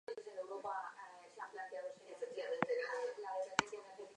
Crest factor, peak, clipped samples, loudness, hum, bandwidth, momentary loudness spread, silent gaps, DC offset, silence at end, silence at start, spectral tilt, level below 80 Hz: 30 dB; -14 dBFS; under 0.1%; -44 LUFS; none; 10.5 kHz; 12 LU; none; under 0.1%; 0 s; 0.1 s; -3 dB/octave; -84 dBFS